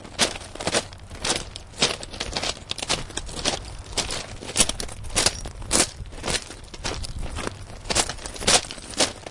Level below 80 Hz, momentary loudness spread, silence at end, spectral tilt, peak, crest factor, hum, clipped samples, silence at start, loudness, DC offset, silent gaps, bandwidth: -38 dBFS; 12 LU; 0 s; -1.5 dB/octave; -2 dBFS; 26 dB; none; under 0.1%; 0 s; -25 LUFS; under 0.1%; none; 11.5 kHz